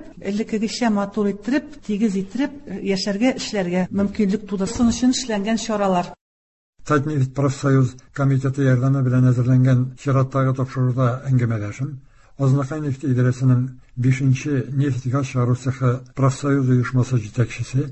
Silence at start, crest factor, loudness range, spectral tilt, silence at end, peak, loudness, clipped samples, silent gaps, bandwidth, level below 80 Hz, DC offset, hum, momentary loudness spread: 0 s; 14 dB; 4 LU; -7 dB/octave; 0 s; -6 dBFS; -21 LUFS; under 0.1%; 6.21-6.73 s; 8.4 kHz; -48 dBFS; under 0.1%; none; 7 LU